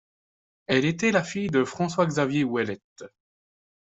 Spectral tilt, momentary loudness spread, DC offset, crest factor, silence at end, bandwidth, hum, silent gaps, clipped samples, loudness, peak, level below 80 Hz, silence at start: -5.5 dB/octave; 8 LU; under 0.1%; 20 dB; 0.9 s; 8.2 kHz; none; 2.84-2.96 s; under 0.1%; -25 LUFS; -6 dBFS; -64 dBFS; 0.7 s